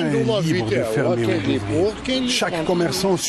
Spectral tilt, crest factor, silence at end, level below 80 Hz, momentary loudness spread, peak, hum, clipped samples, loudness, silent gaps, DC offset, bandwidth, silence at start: -5 dB/octave; 10 dB; 0 s; -46 dBFS; 2 LU; -10 dBFS; none; under 0.1%; -20 LUFS; none; under 0.1%; 12.5 kHz; 0 s